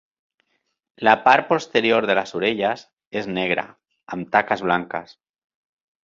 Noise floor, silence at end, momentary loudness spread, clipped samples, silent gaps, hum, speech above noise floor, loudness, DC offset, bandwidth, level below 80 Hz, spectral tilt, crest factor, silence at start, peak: -73 dBFS; 1 s; 16 LU; under 0.1%; 2.93-2.97 s, 3.07-3.11 s; none; 52 dB; -20 LUFS; under 0.1%; 7.6 kHz; -64 dBFS; -5 dB/octave; 20 dB; 1 s; -2 dBFS